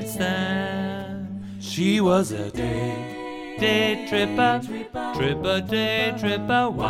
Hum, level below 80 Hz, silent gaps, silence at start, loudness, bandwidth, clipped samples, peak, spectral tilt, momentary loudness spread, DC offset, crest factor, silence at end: none; -48 dBFS; none; 0 s; -24 LUFS; 16 kHz; under 0.1%; -6 dBFS; -5 dB/octave; 12 LU; under 0.1%; 18 dB; 0 s